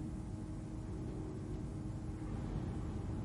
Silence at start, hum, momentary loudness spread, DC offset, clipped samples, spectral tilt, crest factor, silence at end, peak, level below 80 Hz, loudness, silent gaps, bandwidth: 0 s; none; 3 LU; under 0.1%; under 0.1%; -8 dB/octave; 12 dB; 0 s; -30 dBFS; -48 dBFS; -44 LUFS; none; 11.5 kHz